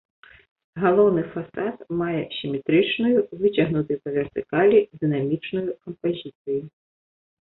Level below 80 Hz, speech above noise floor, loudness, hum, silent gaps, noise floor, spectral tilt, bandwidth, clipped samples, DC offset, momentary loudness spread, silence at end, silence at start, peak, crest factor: -60 dBFS; over 68 dB; -23 LUFS; none; 6.35-6.45 s; under -90 dBFS; -11 dB/octave; 4.1 kHz; under 0.1%; under 0.1%; 11 LU; 0.8 s; 0.75 s; -6 dBFS; 18 dB